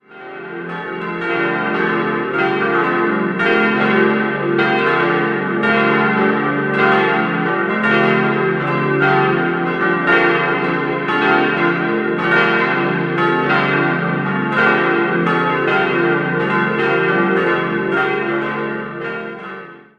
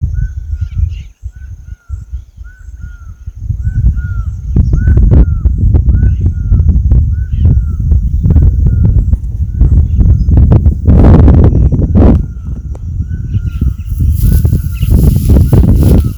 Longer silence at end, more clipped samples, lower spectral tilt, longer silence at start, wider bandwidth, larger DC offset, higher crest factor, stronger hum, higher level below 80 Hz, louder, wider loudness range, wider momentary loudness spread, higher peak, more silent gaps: first, 0.2 s vs 0 s; second, under 0.1% vs 2%; second, -7.5 dB/octave vs -9.5 dB/octave; about the same, 0.1 s vs 0 s; second, 7.2 kHz vs over 20 kHz; neither; first, 16 dB vs 8 dB; neither; second, -58 dBFS vs -12 dBFS; second, -16 LUFS vs -10 LUFS; second, 2 LU vs 12 LU; second, 9 LU vs 19 LU; about the same, 0 dBFS vs 0 dBFS; neither